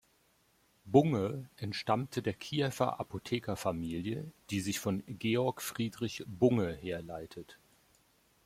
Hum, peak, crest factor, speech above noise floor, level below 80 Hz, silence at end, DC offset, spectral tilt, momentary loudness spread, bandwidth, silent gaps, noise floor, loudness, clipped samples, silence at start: none; -10 dBFS; 24 dB; 37 dB; -66 dBFS; 0.9 s; under 0.1%; -6 dB/octave; 12 LU; 16.5 kHz; none; -71 dBFS; -34 LUFS; under 0.1%; 0.85 s